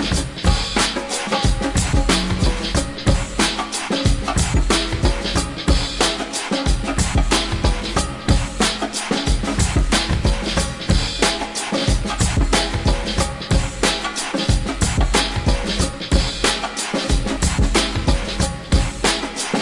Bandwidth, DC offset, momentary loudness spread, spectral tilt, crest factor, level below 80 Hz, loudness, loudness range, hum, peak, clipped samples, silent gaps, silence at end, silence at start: 11.5 kHz; under 0.1%; 4 LU; -4 dB/octave; 18 dB; -24 dBFS; -19 LUFS; 1 LU; none; 0 dBFS; under 0.1%; none; 0 s; 0 s